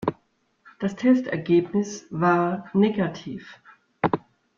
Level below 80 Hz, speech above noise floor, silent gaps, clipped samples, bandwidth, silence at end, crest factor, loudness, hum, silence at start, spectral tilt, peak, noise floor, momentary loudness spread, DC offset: -62 dBFS; 44 dB; none; under 0.1%; 7.4 kHz; 0.4 s; 18 dB; -24 LUFS; none; 0 s; -7 dB/octave; -6 dBFS; -67 dBFS; 10 LU; under 0.1%